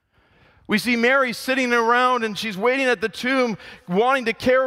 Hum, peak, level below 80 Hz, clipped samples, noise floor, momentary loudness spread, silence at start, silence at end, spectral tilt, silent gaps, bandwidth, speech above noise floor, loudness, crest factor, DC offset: none; -6 dBFS; -58 dBFS; under 0.1%; -58 dBFS; 7 LU; 0.7 s; 0 s; -4.5 dB/octave; none; 16 kHz; 37 dB; -20 LUFS; 14 dB; under 0.1%